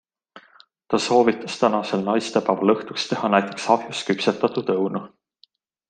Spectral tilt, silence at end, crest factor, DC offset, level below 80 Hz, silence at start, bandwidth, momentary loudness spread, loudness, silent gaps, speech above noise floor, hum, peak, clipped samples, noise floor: -5 dB/octave; 0.85 s; 20 dB; under 0.1%; -68 dBFS; 0.35 s; 9.6 kHz; 6 LU; -22 LUFS; none; 39 dB; none; -2 dBFS; under 0.1%; -60 dBFS